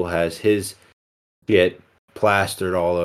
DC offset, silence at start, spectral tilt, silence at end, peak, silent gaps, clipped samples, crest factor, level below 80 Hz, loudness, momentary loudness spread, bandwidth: under 0.1%; 0 s; -5 dB/octave; 0 s; -2 dBFS; 0.93-1.42 s, 1.98-2.08 s; under 0.1%; 20 dB; -52 dBFS; -20 LUFS; 5 LU; 15 kHz